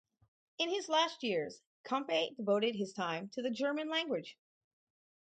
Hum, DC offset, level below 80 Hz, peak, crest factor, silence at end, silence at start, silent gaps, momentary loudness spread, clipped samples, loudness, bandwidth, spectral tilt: none; under 0.1%; -86 dBFS; -18 dBFS; 20 dB; 0.9 s; 0.6 s; 1.66-1.84 s; 8 LU; under 0.1%; -35 LUFS; 9 kHz; -4 dB/octave